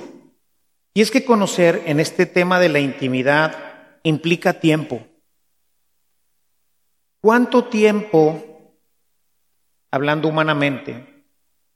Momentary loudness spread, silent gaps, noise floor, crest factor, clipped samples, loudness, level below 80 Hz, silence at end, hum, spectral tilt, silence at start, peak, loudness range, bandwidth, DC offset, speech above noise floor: 14 LU; none; -72 dBFS; 18 dB; under 0.1%; -17 LUFS; -68 dBFS; 0.75 s; none; -5.5 dB/octave; 0 s; 0 dBFS; 6 LU; 14.5 kHz; under 0.1%; 55 dB